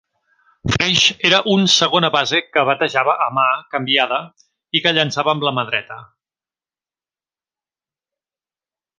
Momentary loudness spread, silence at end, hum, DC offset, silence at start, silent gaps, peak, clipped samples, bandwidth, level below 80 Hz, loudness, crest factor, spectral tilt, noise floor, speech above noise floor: 9 LU; 2.95 s; none; under 0.1%; 0.65 s; none; 0 dBFS; under 0.1%; 10.5 kHz; -50 dBFS; -16 LUFS; 20 dB; -3 dB/octave; under -90 dBFS; over 73 dB